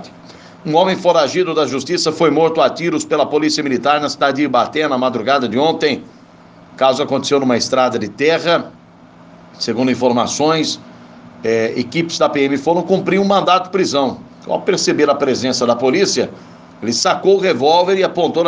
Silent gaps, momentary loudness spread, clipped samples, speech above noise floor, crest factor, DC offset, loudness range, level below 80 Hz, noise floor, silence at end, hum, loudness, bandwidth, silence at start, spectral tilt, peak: none; 6 LU; under 0.1%; 28 dB; 16 dB; under 0.1%; 2 LU; -60 dBFS; -42 dBFS; 0 s; none; -15 LUFS; 10 kHz; 0 s; -4 dB/octave; 0 dBFS